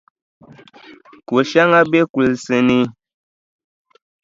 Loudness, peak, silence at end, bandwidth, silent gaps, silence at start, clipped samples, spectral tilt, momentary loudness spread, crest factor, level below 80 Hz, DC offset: -15 LUFS; 0 dBFS; 1.3 s; 7.8 kHz; 2.10-2.14 s; 1.3 s; under 0.1%; -6 dB/octave; 7 LU; 18 dB; -56 dBFS; under 0.1%